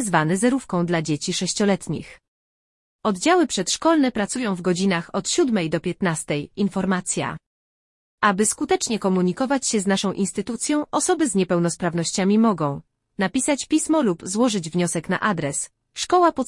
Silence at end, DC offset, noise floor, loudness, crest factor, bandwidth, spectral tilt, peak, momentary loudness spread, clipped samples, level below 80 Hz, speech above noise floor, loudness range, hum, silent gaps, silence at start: 0 s; under 0.1%; under -90 dBFS; -22 LUFS; 18 dB; 12 kHz; -4.5 dB/octave; -4 dBFS; 7 LU; under 0.1%; -56 dBFS; over 69 dB; 2 LU; none; 2.28-2.99 s, 7.46-8.18 s; 0 s